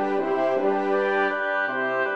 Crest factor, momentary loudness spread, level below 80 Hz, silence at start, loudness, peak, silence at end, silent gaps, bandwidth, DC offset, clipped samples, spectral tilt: 12 dB; 2 LU; -72 dBFS; 0 s; -23 LUFS; -12 dBFS; 0 s; none; 7 kHz; under 0.1%; under 0.1%; -6 dB/octave